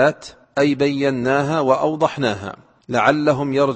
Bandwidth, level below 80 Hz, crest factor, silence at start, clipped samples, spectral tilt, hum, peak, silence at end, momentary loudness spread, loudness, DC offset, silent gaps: 8.6 kHz; -56 dBFS; 18 dB; 0 s; under 0.1%; -6 dB/octave; none; -2 dBFS; 0 s; 10 LU; -18 LUFS; under 0.1%; none